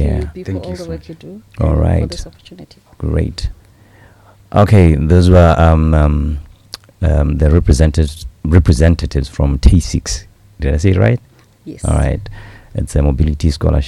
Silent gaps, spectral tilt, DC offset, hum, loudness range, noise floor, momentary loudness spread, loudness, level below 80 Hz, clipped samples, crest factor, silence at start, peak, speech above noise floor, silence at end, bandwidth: none; -7 dB/octave; under 0.1%; none; 8 LU; -44 dBFS; 18 LU; -14 LUFS; -18 dBFS; 0.7%; 14 dB; 0 s; 0 dBFS; 32 dB; 0 s; 11.5 kHz